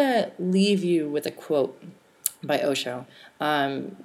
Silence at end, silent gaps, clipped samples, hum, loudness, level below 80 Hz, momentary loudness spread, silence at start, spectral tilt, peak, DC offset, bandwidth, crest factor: 0 s; none; under 0.1%; none; -25 LUFS; -80 dBFS; 9 LU; 0 s; -4.5 dB/octave; 0 dBFS; under 0.1%; over 20 kHz; 26 dB